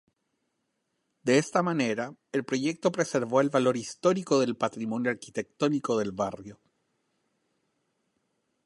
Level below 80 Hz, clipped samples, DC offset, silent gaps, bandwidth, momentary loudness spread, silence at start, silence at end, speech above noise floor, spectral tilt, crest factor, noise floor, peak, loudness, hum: -72 dBFS; under 0.1%; under 0.1%; none; 11.5 kHz; 9 LU; 1.25 s; 2.1 s; 51 dB; -5 dB/octave; 20 dB; -79 dBFS; -10 dBFS; -28 LUFS; none